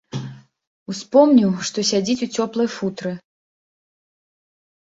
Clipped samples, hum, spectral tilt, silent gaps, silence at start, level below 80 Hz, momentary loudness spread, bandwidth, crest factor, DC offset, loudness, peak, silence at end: under 0.1%; none; -5 dB/octave; 0.67-0.86 s; 0.15 s; -62 dBFS; 18 LU; 8 kHz; 20 dB; under 0.1%; -19 LUFS; -2 dBFS; 1.7 s